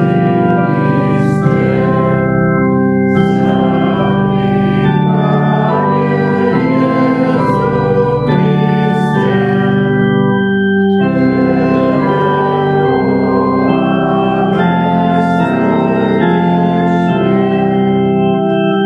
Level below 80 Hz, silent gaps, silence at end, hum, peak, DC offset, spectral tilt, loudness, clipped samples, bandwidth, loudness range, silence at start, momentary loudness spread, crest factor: -40 dBFS; none; 0 s; none; 0 dBFS; under 0.1%; -9 dB/octave; -12 LUFS; under 0.1%; 5.6 kHz; 0 LU; 0 s; 1 LU; 10 dB